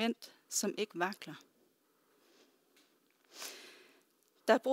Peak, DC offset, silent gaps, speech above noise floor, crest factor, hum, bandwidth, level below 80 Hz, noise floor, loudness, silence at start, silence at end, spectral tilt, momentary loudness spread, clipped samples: -12 dBFS; under 0.1%; none; 35 dB; 26 dB; none; 16 kHz; under -90 dBFS; -73 dBFS; -37 LUFS; 0 s; 0 s; -2.5 dB/octave; 22 LU; under 0.1%